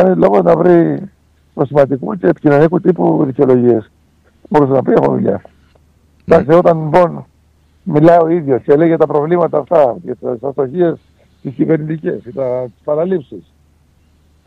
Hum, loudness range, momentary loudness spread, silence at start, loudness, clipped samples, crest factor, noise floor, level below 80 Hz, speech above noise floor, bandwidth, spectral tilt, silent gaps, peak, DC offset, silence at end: none; 6 LU; 12 LU; 0 s; -13 LUFS; under 0.1%; 12 dB; -52 dBFS; -48 dBFS; 40 dB; 6.6 kHz; -10 dB/octave; none; 0 dBFS; under 0.1%; 1.05 s